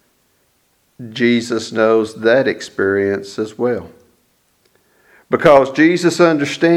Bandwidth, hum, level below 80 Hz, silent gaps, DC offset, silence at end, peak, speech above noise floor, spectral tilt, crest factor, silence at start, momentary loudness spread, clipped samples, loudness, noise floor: 12.5 kHz; none; -56 dBFS; none; under 0.1%; 0 s; 0 dBFS; 46 dB; -5.5 dB/octave; 16 dB; 1 s; 11 LU; under 0.1%; -15 LUFS; -61 dBFS